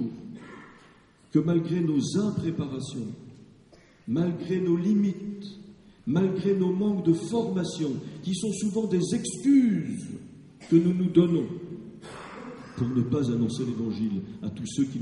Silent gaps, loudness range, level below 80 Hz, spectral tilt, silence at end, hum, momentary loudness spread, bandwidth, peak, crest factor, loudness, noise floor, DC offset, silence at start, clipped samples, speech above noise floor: none; 5 LU; -62 dBFS; -7 dB/octave; 0 s; none; 19 LU; 11.5 kHz; -8 dBFS; 18 dB; -27 LUFS; -56 dBFS; under 0.1%; 0 s; under 0.1%; 31 dB